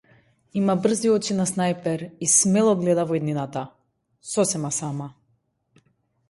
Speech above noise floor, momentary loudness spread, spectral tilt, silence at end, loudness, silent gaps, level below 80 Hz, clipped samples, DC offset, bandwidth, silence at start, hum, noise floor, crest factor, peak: 47 dB; 15 LU; -4.5 dB/octave; 1.2 s; -22 LUFS; none; -64 dBFS; under 0.1%; under 0.1%; 11.5 kHz; 0.55 s; none; -69 dBFS; 20 dB; -4 dBFS